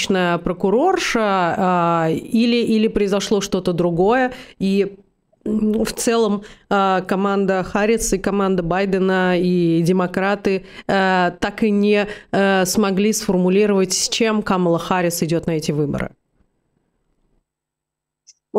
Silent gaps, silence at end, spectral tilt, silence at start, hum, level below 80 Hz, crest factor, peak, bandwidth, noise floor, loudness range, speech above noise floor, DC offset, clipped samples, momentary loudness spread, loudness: none; 0 s; -5 dB/octave; 0 s; none; -44 dBFS; 14 dB; -6 dBFS; 16 kHz; -83 dBFS; 3 LU; 65 dB; under 0.1%; under 0.1%; 5 LU; -18 LUFS